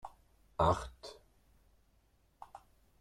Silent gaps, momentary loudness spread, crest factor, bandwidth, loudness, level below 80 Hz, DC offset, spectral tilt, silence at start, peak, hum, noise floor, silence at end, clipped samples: none; 24 LU; 24 dB; 13.5 kHz; -34 LUFS; -56 dBFS; under 0.1%; -6 dB/octave; 0.05 s; -16 dBFS; none; -71 dBFS; 0.45 s; under 0.1%